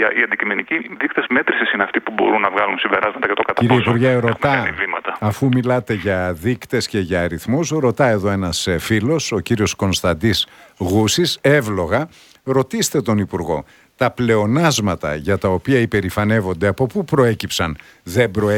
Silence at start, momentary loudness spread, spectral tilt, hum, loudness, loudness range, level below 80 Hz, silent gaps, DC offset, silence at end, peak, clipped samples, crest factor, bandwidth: 0 s; 6 LU; -5 dB/octave; none; -18 LUFS; 2 LU; -44 dBFS; none; under 0.1%; 0 s; 0 dBFS; under 0.1%; 18 dB; 17.5 kHz